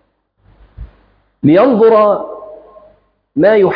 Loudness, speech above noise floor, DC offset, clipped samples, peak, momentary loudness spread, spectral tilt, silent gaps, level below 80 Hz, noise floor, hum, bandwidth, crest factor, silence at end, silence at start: -11 LUFS; 46 dB; under 0.1%; under 0.1%; 0 dBFS; 17 LU; -10 dB/octave; none; -44 dBFS; -55 dBFS; none; 5.2 kHz; 12 dB; 0 s; 0.8 s